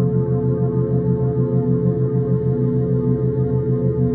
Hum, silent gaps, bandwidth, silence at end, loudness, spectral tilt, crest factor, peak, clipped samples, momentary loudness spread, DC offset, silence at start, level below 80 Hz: none; none; 2 kHz; 0 s; -19 LUFS; -14.5 dB/octave; 12 dB; -6 dBFS; under 0.1%; 1 LU; under 0.1%; 0 s; -40 dBFS